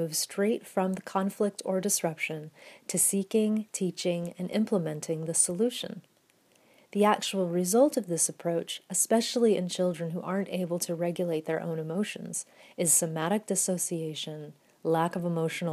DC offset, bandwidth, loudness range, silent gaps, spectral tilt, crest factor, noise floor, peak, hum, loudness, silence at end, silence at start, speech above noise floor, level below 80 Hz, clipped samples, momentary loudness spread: under 0.1%; 15.5 kHz; 3 LU; none; -4 dB/octave; 20 dB; -66 dBFS; -10 dBFS; none; -29 LUFS; 0 s; 0 s; 37 dB; -82 dBFS; under 0.1%; 11 LU